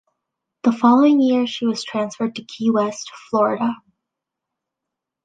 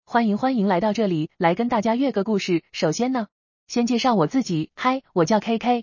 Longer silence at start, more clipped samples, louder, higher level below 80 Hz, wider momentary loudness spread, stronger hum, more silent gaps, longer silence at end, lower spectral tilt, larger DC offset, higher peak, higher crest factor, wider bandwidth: first, 0.65 s vs 0.1 s; neither; first, -19 LUFS vs -22 LUFS; second, -70 dBFS vs -62 dBFS; first, 12 LU vs 5 LU; neither; second, none vs 3.32-3.67 s; first, 1.5 s vs 0 s; about the same, -5 dB/octave vs -5.5 dB/octave; neither; about the same, -2 dBFS vs -4 dBFS; about the same, 18 dB vs 16 dB; first, 9.2 kHz vs 7.2 kHz